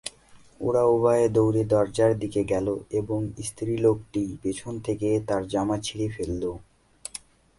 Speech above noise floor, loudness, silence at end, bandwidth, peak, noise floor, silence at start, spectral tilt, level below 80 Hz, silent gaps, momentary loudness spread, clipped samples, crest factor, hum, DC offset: 28 dB; -25 LUFS; 0.4 s; 11.5 kHz; -8 dBFS; -53 dBFS; 0.05 s; -6.5 dB/octave; -50 dBFS; none; 14 LU; under 0.1%; 18 dB; none; under 0.1%